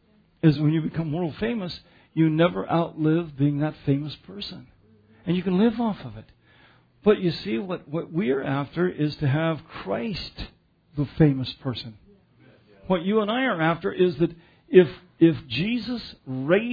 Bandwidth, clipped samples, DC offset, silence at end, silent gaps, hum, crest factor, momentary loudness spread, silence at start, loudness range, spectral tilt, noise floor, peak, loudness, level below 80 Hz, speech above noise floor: 5 kHz; under 0.1%; under 0.1%; 0 s; none; none; 22 dB; 15 LU; 0.45 s; 5 LU; -9 dB/octave; -57 dBFS; -2 dBFS; -24 LUFS; -52 dBFS; 33 dB